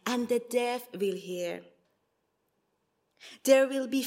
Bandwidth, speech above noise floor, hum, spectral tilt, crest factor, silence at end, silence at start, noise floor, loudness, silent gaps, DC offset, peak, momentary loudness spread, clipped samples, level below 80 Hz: 16 kHz; 48 dB; none; -3.5 dB/octave; 22 dB; 0 s; 0.05 s; -77 dBFS; -29 LUFS; none; under 0.1%; -10 dBFS; 12 LU; under 0.1%; -86 dBFS